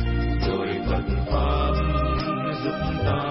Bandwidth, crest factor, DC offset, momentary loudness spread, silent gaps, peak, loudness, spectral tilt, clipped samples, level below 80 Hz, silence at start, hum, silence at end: 5.8 kHz; 14 dB; under 0.1%; 3 LU; none; -10 dBFS; -25 LUFS; -11 dB/octave; under 0.1%; -28 dBFS; 0 s; none; 0 s